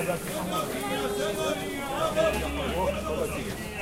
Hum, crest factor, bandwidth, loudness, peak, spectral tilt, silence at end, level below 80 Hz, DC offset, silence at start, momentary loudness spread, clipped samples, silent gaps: none; 16 dB; 16 kHz; -29 LUFS; -14 dBFS; -4.5 dB/octave; 0 s; -42 dBFS; under 0.1%; 0 s; 6 LU; under 0.1%; none